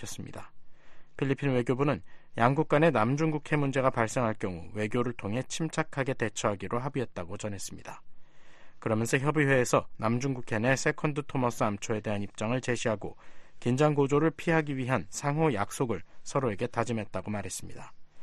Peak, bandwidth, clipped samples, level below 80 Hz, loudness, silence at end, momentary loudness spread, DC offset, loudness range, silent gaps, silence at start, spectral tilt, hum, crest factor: -8 dBFS; 12.5 kHz; under 0.1%; -56 dBFS; -30 LUFS; 0 s; 12 LU; under 0.1%; 5 LU; none; 0 s; -6 dB/octave; none; 22 dB